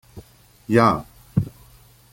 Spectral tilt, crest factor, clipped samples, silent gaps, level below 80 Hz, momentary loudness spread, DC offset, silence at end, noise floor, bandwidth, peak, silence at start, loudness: -7.5 dB/octave; 22 dB; under 0.1%; none; -48 dBFS; 16 LU; under 0.1%; 0.65 s; -51 dBFS; 16.5 kHz; -2 dBFS; 0.15 s; -21 LUFS